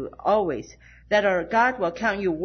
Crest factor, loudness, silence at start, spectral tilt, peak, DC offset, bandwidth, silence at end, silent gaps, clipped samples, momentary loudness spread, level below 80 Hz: 16 dB; -23 LUFS; 0 s; -5.5 dB/octave; -8 dBFS; under 0.1%; 6.6 kHz; 0 s; none; under 0.1%; 5 LU; -52 dBFS